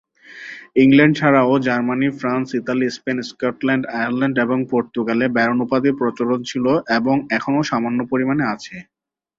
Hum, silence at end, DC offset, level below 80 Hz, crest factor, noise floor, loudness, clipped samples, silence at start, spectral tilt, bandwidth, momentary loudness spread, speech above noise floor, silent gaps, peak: none; 0.55 s; under 0.1%; -58 dBFS; 18 dB; -38 dBFS; -18 LUFS; under 0.1%; 0.3 s; -6.5 dB/octave; 7.6 kHz; 10 LU; 20 dB; none; -2 dBFS